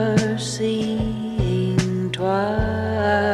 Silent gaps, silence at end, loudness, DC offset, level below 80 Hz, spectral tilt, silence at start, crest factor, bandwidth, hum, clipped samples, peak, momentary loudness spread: none; 0 s; -22 LUFS; under 0.1%; -36 dBFS; -6 dB/octave; 0 s; 16 dB; 12.5 kHz; none; under 0.1%; -4 dBFS; 4 LU